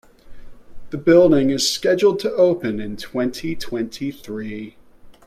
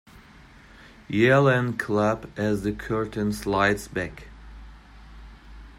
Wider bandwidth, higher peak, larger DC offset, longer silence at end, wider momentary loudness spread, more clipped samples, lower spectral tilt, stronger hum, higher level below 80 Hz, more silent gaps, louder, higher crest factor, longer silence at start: about the same, 15 kHz vs 16 kHz; first, -2 dBFS vs -6 dBFS; neither; about the same, 0.15 s vs 0.05 s; first, 17 LU vs 13 LU; neither; second, -5 dB/octave vs -6.5 dB/octave; neither; about the same, -46 dBFS vs -46 dBFS; neither; first, -19 LUFS vs -24 LUFS; about the same, 18 dB vs 20 dB; about the same, 0.25 s vs 0.15 s